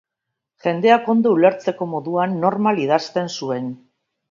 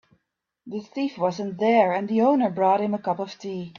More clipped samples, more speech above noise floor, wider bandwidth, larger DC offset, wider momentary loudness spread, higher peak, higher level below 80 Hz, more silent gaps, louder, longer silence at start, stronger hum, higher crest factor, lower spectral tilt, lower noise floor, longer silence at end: neither; first, 63 dB vs 55 dB; about the same, 7.4 kHz vs 7.2 kHz; neither; about the same, 11 LU vs 13 LU; first, 0 dBFS vs -6 dBFS; about the same, -70 dBFS vs -70 dBFS; neither; first, -19 LUFS vs -23 LUFS; about the same, 0.65 s vs 0.65 s; neither; about the same, 20 dB vs 18 dB; about the same, -6 dB/octave vs -7 dB/octave; about the same, -81 dBFS vs -78 dBFS; first, 0.55 s vs 0.1 s